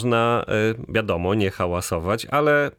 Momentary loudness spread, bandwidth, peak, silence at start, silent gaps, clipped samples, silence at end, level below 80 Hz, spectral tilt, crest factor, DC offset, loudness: 6 LU; 17.5 kHz; -6 dBFS; 0 s; none; under 0.1%; 0.05 s; -46 dBFS; -5.5 dB/octave; 16 dB; under 0.1%; -22 LUFS